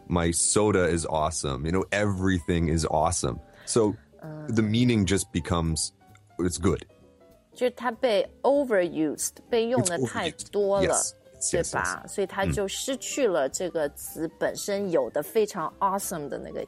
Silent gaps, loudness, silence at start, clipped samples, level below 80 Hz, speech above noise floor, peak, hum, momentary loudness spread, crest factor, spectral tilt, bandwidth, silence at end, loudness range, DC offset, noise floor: none; -26 LUFS; 0.1 s; under 0.1%; -46 dBFS; 30 dB; -8 dBFS; none; 8 LU; 18 dB; -4.5 dB/octave; 16 kHz; 0 s; 3 LU; under 0.1%; -56 dBFS